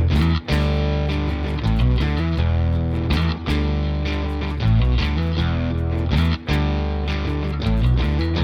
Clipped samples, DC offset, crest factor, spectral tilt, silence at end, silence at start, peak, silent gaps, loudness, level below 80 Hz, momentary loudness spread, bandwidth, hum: under 0.1%; under 0.1%; 12 dB; -7.5 dB/octave; 0 s; 0 s; -8 dBFS; none; -21 LUFS; -24 dBFS; 4 LU; 6.6 kHz; none